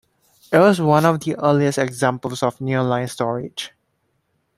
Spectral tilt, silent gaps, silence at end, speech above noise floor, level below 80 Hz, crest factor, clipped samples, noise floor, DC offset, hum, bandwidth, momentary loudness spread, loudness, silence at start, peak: -6 dB/octave; none; 0.9 s; 51 dB; -60 dBFS; 18 dB; under 0.1%; -69 dBFS; under 0.1%; none; 15.5 kHz; 11 LU; -19 LUFS; 0.5 s; -2 dBFS